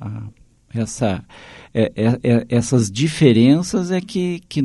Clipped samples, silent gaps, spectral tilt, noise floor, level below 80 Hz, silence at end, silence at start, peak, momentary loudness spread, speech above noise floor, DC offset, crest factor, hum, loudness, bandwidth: under 0.1%; none; -6.5 dB/octave; -39 dBFS; -48 dBFS; 0 s; 0 s; 0 dBFS; 15 LU; 22 dB; under 0.1%; 18 dB; none; -18 LUFS; 11.5 kHz